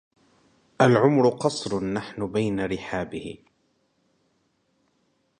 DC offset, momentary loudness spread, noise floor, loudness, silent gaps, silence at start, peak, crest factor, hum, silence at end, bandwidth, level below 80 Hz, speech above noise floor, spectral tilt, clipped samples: under 0.1%; 16 LU; -70 dBFS; -24 LUFS; none; 0.8 s; -4 dBFS; 22 dB; none; 2.05 s; 10.5 kHz; -56 dBFS; 46 dB; -6 dB/octave; under 0.1%